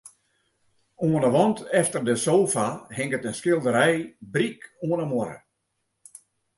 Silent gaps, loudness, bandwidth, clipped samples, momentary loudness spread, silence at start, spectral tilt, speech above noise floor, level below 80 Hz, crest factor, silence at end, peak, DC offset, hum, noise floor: none; -24 LUFS; 11.5 kHz; under 0.1%; 9 LU; 0.05 s; -5 dB/octave; 53 dB; -66 dBFS; 20 dB; 1.2 s; -6 dBFS; under 0.1%; none; -77 dBFS